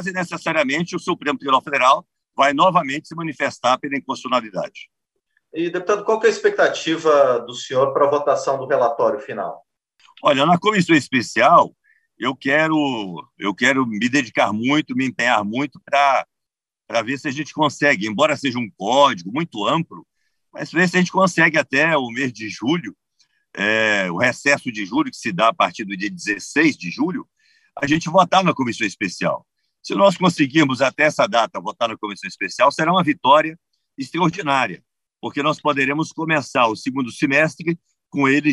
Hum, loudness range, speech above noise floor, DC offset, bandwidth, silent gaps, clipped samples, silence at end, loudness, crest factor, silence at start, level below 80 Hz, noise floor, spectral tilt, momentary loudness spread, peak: none; 3 LU; 66 dB; under 0.1%; 12 kHz; none; under 0.1%; 0 s; -19 LUFS; 18 dB; 0 s; -66 dBFS; -85 dBFS; -4.5 dB/octave; 11 LU; -2 dBFS